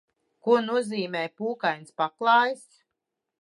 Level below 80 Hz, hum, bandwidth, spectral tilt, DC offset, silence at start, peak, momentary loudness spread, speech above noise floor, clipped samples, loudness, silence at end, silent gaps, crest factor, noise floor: -84 dBFS; none; 11.5 kHz; -4.5 dB/octave; under 0.1%; 0.45 s; -8 dBFS; 10 LU; 59 dB; under 0.1%; -25 LUFS; 0.85 s; none; 18 dB; -84 dBFS